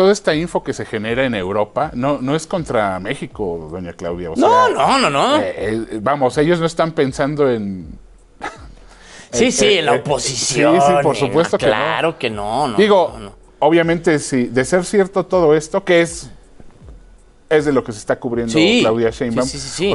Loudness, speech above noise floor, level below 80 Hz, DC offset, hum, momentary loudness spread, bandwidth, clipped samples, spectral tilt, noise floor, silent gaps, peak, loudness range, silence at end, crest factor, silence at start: -16 LUFS; 29 dB; -42 dBFS; under 0.1%; none; 11 LU; 11.5 kHz; under 0.1%; -4.5 dB/octave; -45 dBFS; none; -2 dBFS; 4 LU; 0 s; 14 dB; 0 s